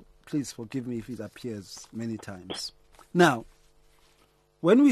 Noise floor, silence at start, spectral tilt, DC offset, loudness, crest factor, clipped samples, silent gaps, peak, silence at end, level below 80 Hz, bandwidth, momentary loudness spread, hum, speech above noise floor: -64 dBFS; 0.3 s; -5.5 dB/octave; under 0.1%; -29 LUFS; 20 dB; under 0.1%; none; -8 dBFS; 0 s; -62 dBFS; 13 kHz; 16 LU; none; 38 dB